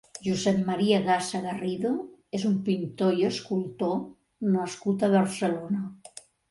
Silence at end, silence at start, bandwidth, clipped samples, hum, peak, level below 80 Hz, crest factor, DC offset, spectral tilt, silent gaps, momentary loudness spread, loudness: 0.55 s; 0.15 s; 11.5 kHz; under 0.1%; none; -10 dBFS; -66 dBFS; 18 dB; under 0.1%; -6 dB/octave; none; 10 LU; -27 LUFS